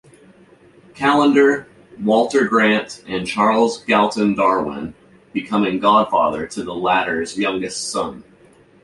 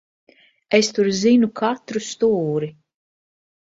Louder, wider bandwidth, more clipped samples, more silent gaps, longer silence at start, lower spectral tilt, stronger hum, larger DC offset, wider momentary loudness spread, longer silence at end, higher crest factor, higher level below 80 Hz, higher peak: about the same, -18 LUFS vs -19 LUFS; first, 11.5 kHz vs 7.8 kHz; neither; neither; first, 0.95 s vs 0.7 s; about the same, -4.5 dB/octave vs -4.5 dB/octave; neither; neither; about the same, 12 LU vs 10 LU; second, 0.65 s vs 0.9 s; about the same, 16 dB vs 20 dB; first, -54 dBFS vs -62 dBFS; about the same, -2 dBFS vs -2 dBFS